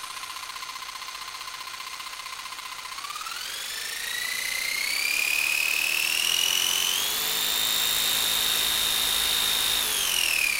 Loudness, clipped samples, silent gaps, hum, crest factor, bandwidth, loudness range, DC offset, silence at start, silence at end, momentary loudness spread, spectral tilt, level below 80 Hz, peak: -23 LUFS; under 0.1%; none; none; 18 dB; 16 kHz; 12 LU; under 0.1%; 0 s; 0 s; 13 LU; 2 dB/octave; -56 dBFS; -10 dBFS